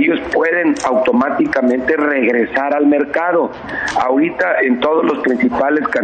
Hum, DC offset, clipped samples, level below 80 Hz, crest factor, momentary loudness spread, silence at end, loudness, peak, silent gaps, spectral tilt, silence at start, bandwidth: none; under 0.1%; under 0.1%; -48 dBFS; 10 dB; 2 LU; 0 s; -15 LUFS; -4 dBFS; none; -5 dB/octave; 0 s; 9 kHz